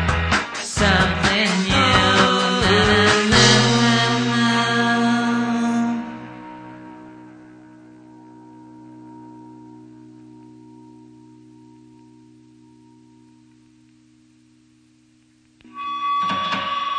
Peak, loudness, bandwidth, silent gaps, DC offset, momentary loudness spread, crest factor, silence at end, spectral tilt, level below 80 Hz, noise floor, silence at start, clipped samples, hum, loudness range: 0 dBFS; -17 LUFS; 10 kHz; none; under 0.1%; 21 LU; 20 dB; 0 s; -4 dB/octave; -40 dBFS; -56 dBFS; 0 s; under 0.1%; none; 17 LU